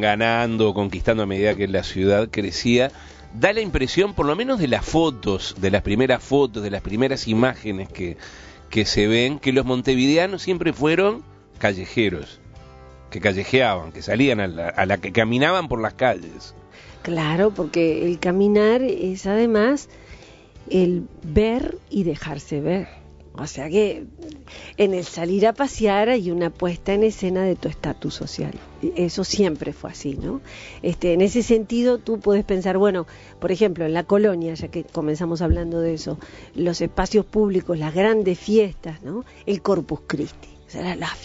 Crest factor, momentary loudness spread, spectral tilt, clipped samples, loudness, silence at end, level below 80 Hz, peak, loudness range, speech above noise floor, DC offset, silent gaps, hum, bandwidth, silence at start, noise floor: 20 dB; 12 LU; -5.5 dB/octave; under 0.1%; -21 LUFS; 0 s; -40 dBFS; 0 dBFS; 4 LU; 24 dB; under 0.1%; none; none; 8 kHz; 0 s; -45 dBFS